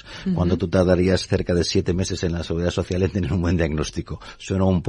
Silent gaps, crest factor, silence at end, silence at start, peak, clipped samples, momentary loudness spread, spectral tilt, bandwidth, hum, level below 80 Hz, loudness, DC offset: none; 16 dB; 0 s; 0.05 s; -4 dBFS; under 0.1%; 8 LU; -6 dB/octave; 11 kHz; none; -40 dBFS; -22 LUFS; under 0.1%